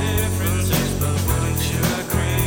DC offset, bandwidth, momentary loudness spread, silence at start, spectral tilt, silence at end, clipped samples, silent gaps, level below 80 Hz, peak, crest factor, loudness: under 0.1%; over 20 kHz; 2 LU; 0 s; -4.5 dB/octave; 0 s; under 0.1%; none; -30 dBFS; -6 dBFS; 14 dB; -21 LUFS